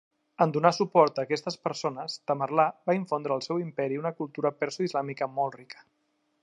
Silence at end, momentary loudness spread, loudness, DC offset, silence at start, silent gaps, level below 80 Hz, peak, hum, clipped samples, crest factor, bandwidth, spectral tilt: 0.7 s; 10 LU; -28 LUFS; under 0.1%; 0.4 s; none; -82 dBFS; -6 dBFS; none; under 0.1%; 24 dB; 10.5 kHz; -5.5 dB/octave